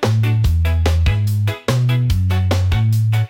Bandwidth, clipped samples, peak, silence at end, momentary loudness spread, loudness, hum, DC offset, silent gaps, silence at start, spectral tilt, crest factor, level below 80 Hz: 16.5 kHz; under 0.1%; -4 dBFS; 0 s; 2 LU; -17 LUFS; none; under 0.1%; none; 0 s; -6.5 dB/octave; 10 dB; -26 dBFS